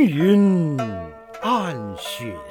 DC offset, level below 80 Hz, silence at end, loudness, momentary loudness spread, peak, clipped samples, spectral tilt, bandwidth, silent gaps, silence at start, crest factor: under 0.1%; -54 dBFS; 0 s; -21 LUFS; 15 LU; -6 dBFS; under 0.1%; -7 dB/octave; 17.5 kHz; none; 0 s; 14 dB